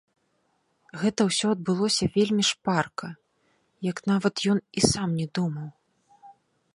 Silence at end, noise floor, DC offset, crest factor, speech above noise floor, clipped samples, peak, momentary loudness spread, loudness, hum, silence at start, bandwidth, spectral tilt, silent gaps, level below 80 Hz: 0.45 s; -71 dBFS; under 0.1%; 24 dB; 46 dB; under 0.1%; -2 dBFS; 12 LU; -25 LUFS; none; 0.95 s; 11.5 kHz; -4.5 dB/octave; none; -58 dBFS